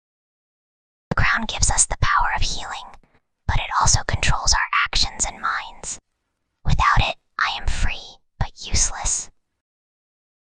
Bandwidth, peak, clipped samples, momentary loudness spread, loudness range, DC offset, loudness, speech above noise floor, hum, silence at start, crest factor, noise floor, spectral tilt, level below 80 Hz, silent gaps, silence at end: 10 kHz; -2 dBFS; under 0.1%; 14 LU; 4 LU; under 0.1%; -21 LUFS; 54 dB; none; 1.1 s; 20 dB; -75 dBFS; -2 dB/octave; -28 dBFS; none; 1.25 s